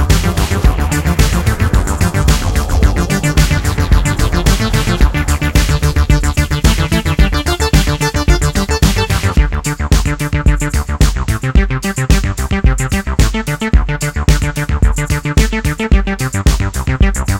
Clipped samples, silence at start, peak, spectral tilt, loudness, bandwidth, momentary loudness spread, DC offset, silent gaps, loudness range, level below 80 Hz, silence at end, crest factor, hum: under 0.1%; 0 s; 0 dBFS; -5 dB/octave; -14 LUFS; 17 kHz; 4 LU; 0.2%; none; 2 LU; -14 dBFS; 0 s; 12 dB; none